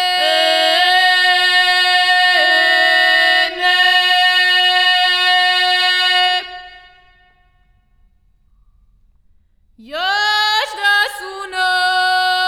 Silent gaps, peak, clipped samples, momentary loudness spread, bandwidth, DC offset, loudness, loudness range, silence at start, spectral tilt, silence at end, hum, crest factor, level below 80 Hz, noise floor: none; 0 dBFS; under 0.1%; 6 LU; 16 kHz; under 0.1%; -12 LUFS; 10 LU; 0 s; 1.5 dB/octave; 0 s; none; 14 dB; -56 dBFS; -55 dBFS